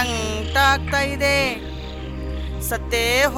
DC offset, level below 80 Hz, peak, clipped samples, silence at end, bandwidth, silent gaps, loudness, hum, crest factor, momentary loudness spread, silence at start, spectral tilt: under 0.1%; -32 dBFS; -4 dBFS; under 0.1%; 0 s; 17.5 kHz; none; -20 LUFS; none; 18 dB; 14 LU; 0 s; -3.5 dB/octave